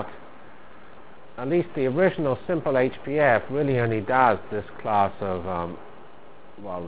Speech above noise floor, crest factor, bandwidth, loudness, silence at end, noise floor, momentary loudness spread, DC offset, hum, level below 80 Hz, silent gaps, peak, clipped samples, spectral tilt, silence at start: 25 dB; 22 dB; 4 kHz; -24 LUFS; 0 s; -49 dBFS; 15 LU; 1%; none; -52 dBFS; none; -4 dBFS; under 0.1%; -10.5 dB/octave; 0 s